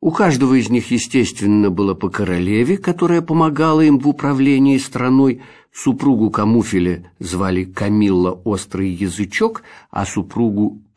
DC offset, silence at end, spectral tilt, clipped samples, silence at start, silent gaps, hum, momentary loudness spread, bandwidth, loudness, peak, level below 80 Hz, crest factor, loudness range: 0.4%; 0.2 s; -6.5 dB/octave; under 0.1%; 0 s; none; none; 9 LU; 11 kHz; -16 LUFS; -2 dBFS; -48 dBFS; 14 dB; 4 LU